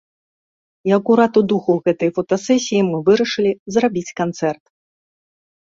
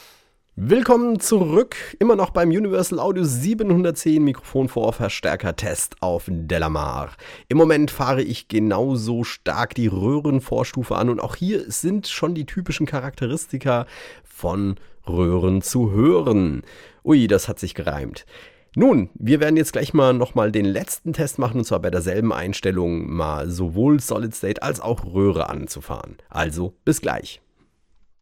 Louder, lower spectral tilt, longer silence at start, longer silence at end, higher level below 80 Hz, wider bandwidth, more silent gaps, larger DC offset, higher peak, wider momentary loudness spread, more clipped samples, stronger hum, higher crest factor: first, -17 LUFS vs -21 LUFS; about the same, -5.5 dB/octave vs -6 dB/octave; first, 0.85 s vs 0.55 s; first, 1.25 s vs 0.85 s; second, -60 dBFS vs -42 dBFS; second, 7.8 kHz vs 17.5 kHz; first, 3.59-3.66 s vs none; neither; about the same, -2 dBFS vs -2 dBFS; about the same, 9 LU vs 11 LU; neither; neither; about the same, 16 dB vs 20 dB